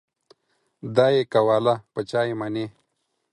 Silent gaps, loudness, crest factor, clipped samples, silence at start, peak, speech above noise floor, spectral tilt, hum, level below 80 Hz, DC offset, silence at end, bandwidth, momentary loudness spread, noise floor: none; -22 LUFS; 20 dB; under 0.1%; 0.85 s; -4 dBFS; 53 dB; -6.5 dB/octave; none; -66 dBFS; under 0.1%; 0.65 s; 11 kHz; 12 LU; -75 dBFS